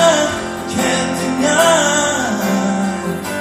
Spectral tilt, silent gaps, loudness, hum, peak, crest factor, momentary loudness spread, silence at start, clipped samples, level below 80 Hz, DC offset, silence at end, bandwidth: -3.5 dB/octave; none; -16 LUFS; none; 0 dBFS; 14 dB; 10 LU; 0 s; under 0.1%; -48 dBFS; under 0.1%; 0 s; 15.5 kHz